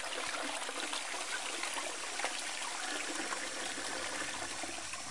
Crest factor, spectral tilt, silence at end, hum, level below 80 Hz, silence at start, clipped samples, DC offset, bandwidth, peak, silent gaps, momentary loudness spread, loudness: 20 dB; 0 dB/octave; 0 s; none; -72 dBFS; 0 s; under 0.1%; 0.3%; 11.5 kHz; -20 dBFS; none; 2 LU; -37 LUFS